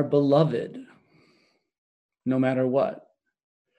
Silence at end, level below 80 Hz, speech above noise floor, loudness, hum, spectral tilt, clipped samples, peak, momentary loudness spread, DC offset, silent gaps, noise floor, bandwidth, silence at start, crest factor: 0.8 s; -74 dBFS; 43 dB; -24 LUFS; none; -9 dB/octave; under 0.1%; -6 dBFS; 18 LU; under 0.1%; 1.78-2.09 s; -66 dBFS; 8.4 kHz; 0 s; 20 dB